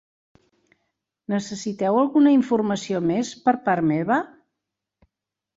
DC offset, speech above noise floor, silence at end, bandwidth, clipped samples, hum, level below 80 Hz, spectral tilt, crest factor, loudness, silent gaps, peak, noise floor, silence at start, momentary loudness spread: under 0.1%; 64 dB; 1.3 s; 7.8 kHz; under 0.1%; none; -66 dBFS; -6 dB/octave; 18 dB; -22 LUFS; none; -6 dBFS; -85 dBFS; 1.3 s; 11 LU